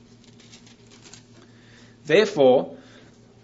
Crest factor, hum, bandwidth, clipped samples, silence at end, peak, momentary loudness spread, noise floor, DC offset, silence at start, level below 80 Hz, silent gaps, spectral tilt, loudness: 20 dB; none; 8 kHz; under 0.1%; 0.7 s; -4 dBFS; 20 LU; -50 dBFS; under 0.1%; 2.05 s; -66 dBFS; none; -5 dB/octave; -19 LUFS